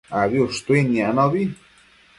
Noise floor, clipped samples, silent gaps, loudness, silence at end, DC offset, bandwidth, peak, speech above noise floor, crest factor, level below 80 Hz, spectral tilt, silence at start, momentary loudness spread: -53 dBFS; under 0.1%; none; -20 LUFS; 0.65 s; under 0.1%; 11.5 kHz; -4 dBFS; 34 dB; 16 dB; -54 dBFS; -6.5 dB/octave; 0.1 s; 5 LU